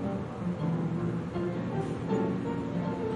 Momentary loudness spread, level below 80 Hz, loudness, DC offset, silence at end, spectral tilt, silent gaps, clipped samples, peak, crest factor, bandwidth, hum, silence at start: 3 LU; -56 dBFS; -32 LUFS; under 0.1%; 0 s; -8.5 dB/octave; none; under 0.1%; -18 dBFS; 14 dB; 10.5 kHz; none; 0 s